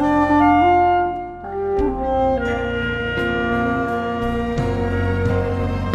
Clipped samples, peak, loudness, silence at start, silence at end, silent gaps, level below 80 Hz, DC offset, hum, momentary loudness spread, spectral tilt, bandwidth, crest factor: under 0.1%; -4 dBFS; -19 LUFS; 0 s; 0 s; none; -34 dBFS; under 0.1%; none; 8 LU; -8 dB/octave; 10.5 kHz; 14 dB